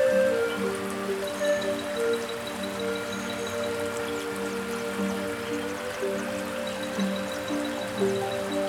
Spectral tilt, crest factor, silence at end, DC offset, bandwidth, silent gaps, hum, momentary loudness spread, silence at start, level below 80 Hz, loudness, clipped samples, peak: -4 dB/octave; 14 dB; 0 s; under 0.1%; 19.5 kHz; none; none; 5 LU; 0 s; -62 dBFS; -29 LUFS; under 0.1%; -14 dBFS